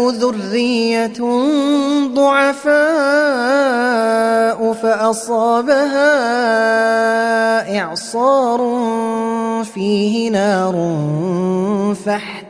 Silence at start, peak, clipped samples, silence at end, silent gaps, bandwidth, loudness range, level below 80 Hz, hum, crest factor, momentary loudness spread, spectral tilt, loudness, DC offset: 0 s; -2 dBFS; under 0.1%; 0 s; none; 11 kHz; 3 LU; -64 dBFS; none; 14 dB; 5 LU; -5 dB/octave; -15 LUFS; under 0.1%